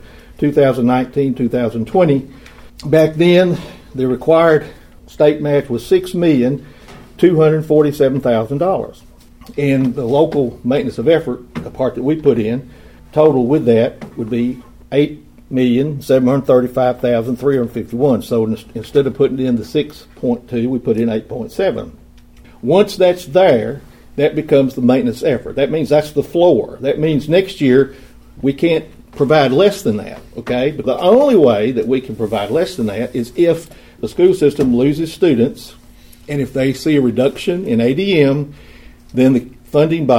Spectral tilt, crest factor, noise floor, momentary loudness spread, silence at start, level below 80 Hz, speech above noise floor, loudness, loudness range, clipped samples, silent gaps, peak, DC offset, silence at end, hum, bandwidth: -7 dB/octave; 14 dB; -41 dBFS; 10 LU; 0.4 s; -44 dBFS; 27 dB; -15 LUFS; 3 LU; under 0.1%; none; 0 dBFS; under 0.1%; 0 s; none; 16.5 kHz